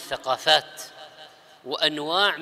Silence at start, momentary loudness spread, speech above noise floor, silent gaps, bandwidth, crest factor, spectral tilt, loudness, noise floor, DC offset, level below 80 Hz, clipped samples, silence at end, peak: 0 s; 24 LU; 24 dB; none; 16 kHz; 22 dB; -1.5 dB/octave; -22 LUFS; -49 dBFS; under 0.1%; -68 dBFS; under 0.1%; 0 s; -4 dBFS